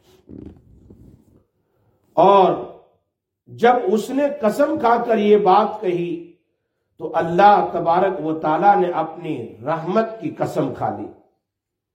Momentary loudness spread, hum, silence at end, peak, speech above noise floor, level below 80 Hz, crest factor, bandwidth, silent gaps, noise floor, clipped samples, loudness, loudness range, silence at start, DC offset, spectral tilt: 15 LU; none; 0.8 s; -2 dBFS; 63 dB; -60 dBFS; 18 dB; 16.5 kHz; none; -81 dBFS; under 0.1%; -18 LUFS; 4 LU; 0.3 s; under 0.1%; -7 dB/octave